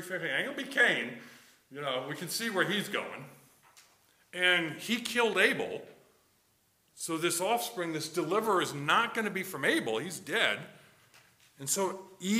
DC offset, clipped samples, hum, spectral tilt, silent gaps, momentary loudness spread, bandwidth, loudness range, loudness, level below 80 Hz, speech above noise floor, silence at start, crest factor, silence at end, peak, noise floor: under 0.1%; under 0.1%; none; -2.5 dB/octave; none; 13 LU; 16 kHz; 3 LU; -30 LUFS; -80 dBFS; 39 dB; 0 s; 22 dB; 0 s; -10 dBFS; -71 dBFS